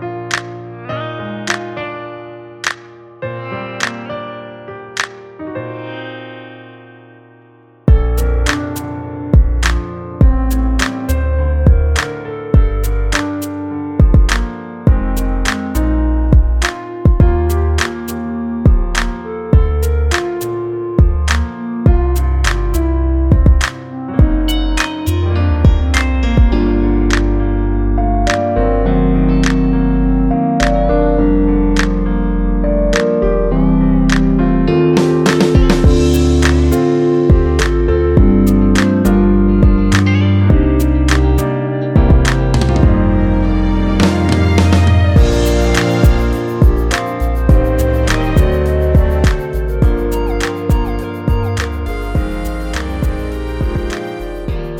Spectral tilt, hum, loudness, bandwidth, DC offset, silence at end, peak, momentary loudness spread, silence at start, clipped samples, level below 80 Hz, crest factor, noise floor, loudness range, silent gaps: -6.5 dB/octave; none; -14 LUFS; 17 kHz; under 0.1%; 0 s; 0 dBFS; 12 LU; 0 s; under 0.1%; -16 dBFS; 12 dB; -45 dBFS; 10 LU; none